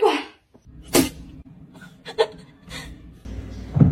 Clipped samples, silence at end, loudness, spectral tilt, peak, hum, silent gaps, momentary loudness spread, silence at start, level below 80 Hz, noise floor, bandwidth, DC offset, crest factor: under 0.1%; 0 s; -24 LUFS; -5.5 dB/octave; -2 dBFS; none; none; 24 LU; 0 s; -40 dBFS; -49 dBFS; 16.5 kHz; under 0.1%; 22 dB